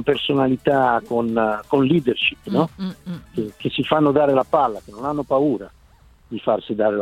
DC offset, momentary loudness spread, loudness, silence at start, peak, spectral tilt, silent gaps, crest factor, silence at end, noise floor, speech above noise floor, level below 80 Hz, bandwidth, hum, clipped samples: under 0.1%; 12 LU; -20 LUFS; 0 s; -2 dBFS; -7.5 dB/octave; none; 18 dB; 0 s; -51 dBFS; 31 dB; -52 dBFS; 14 kHz; none; under 0.1%